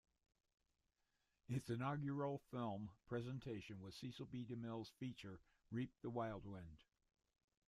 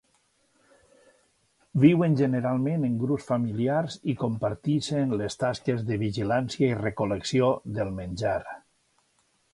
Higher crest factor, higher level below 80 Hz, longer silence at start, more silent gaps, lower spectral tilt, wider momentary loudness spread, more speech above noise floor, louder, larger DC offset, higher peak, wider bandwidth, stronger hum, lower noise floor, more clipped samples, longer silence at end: about the same, 16 dB vs 20 dB; second, -74 dBFS vs -56 dBFS; second, 1.5 s vs 1.75 s; neither; about the same, -7.5 dB/octave vs -7 dB/octave; first, 12 LU vs 9 LU; second, 39 dB vs 43 dB; second, -49 LUFS vs -26 LUFS; neither; second, -34 dBFS vs -6 dBFS; first, 14 kHz vs 11.5 kHz; neither; first, -88 dBFS vs -69 dBFS; neither; about the same, 0.85 s vs 0.95 s